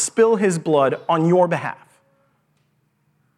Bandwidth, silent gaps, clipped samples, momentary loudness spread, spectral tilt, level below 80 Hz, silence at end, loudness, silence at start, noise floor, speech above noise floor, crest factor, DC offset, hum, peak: 12.5 kHz; none; under 0.1%; 11 LU; -5.5 dB/octave; -76 dBFS; 1.65 s; -18 LUFS; 0 s; -65 dBFS; 48 dB; 16 dB; under 0.1%; none; -4 dBFS